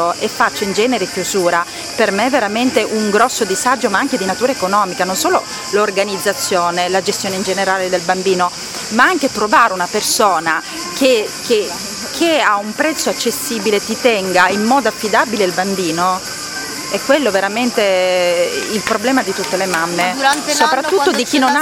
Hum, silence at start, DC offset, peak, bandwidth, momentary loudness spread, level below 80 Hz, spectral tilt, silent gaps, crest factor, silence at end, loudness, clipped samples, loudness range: none; 0 s; under 0.1%; 0 dBFS; 17 kHz; 5 LU; -52 dBFS; -2.5 dB/octave; none; 16 dB; 0 s; -15 LUFS; under 0.1%; 2 LU